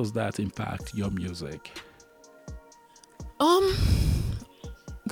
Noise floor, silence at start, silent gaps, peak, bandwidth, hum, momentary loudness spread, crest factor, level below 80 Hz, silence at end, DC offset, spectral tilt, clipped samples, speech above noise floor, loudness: -55 dBFS; 0 s; none; -10 dBFS; 17.5 kHz; none; 23 LU; 18 dB; -36 dBFS; 0 s; under 0.1%; -6 dB/octave; under 0.1%; 29 dB; -28 LUFS